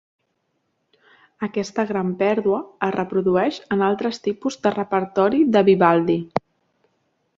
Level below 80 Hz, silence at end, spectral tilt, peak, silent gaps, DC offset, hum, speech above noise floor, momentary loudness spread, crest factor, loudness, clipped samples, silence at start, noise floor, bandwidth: -62 dBFS; 1 s; -7 dB/octave; -2 dBFS; none; under 0.1%; none; 52 dB; 9 LU; 20 dB; -20 LUFS; under 0.1%; 1.4 s; -72 dBFS; 7.6 kHz